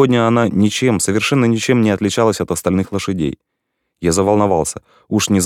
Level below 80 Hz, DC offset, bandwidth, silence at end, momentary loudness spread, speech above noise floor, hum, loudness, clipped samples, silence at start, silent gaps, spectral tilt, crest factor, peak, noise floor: -44 dBFS; under 0.1%; 16.5 kHz; 0 s; 8 LU; 58 dB; none; -16 LUFS; under 0.1%; 0 s; none; -5 dB/octave; 16 dB; 0 dBFS; -73 dBFS